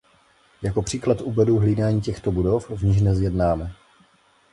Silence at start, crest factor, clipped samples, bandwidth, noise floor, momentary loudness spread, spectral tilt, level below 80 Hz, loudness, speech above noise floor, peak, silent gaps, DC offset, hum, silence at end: 0.6 s; 16 dB; under 0.1%; 11.5 kHz; -59 dBFS; 7 LU; -7.5 dB/octave; -36 dBFS; -22 LUFS; 38 dB; -6 dBFS; none; under 0.1%; none; 0.8 s